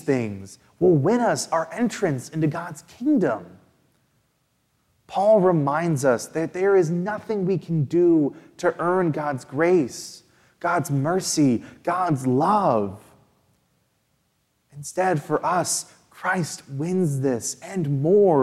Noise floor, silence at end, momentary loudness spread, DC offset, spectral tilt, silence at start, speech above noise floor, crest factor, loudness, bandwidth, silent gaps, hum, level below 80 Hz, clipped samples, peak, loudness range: -69 dBFS; 0 s; 11 LU; under 0.1%; -6 dB/octave; 0.05 s; 48 dB; 16 dB; -22 LUFS; 14.5 kHz; none; none; -66 dBFS; under 0.1%; -6 dBFS; 5 LU